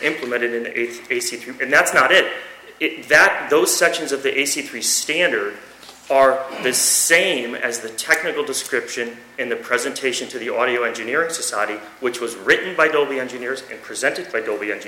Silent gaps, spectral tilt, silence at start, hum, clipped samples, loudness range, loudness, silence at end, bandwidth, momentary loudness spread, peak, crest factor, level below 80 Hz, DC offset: none; -1 dB/octave; 0 s; none; under 0.1%; 6 LU; -19 LUFS; 0 s; 16.5 kHz; 12 LU; -4 dBFS; 16 dB; -64 dBFS; under 0.1%